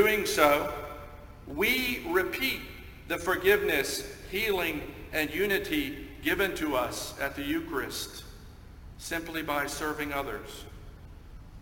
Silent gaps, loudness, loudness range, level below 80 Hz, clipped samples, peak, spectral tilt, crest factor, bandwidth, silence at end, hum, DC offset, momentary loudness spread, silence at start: none; -29 LUFS; 6 LU; -48 dBFS; under 0.1%; -6 dBFS; -3.5 dB/octave; 24 dB; 17 kHz; 0 s; none; under 0.1%; 21 LU; 0 s